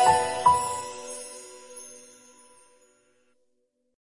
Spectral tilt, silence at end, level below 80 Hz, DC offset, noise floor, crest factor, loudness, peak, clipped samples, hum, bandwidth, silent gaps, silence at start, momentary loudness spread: -2 dB/octave; 2.05 s; -64 dBFS; under 0.1%; -73 dBFS; 20 dB; -25 LUFS; -8 dBFS; under 0.1%; none; 11.5 kHz; none; 0 s; 21 LU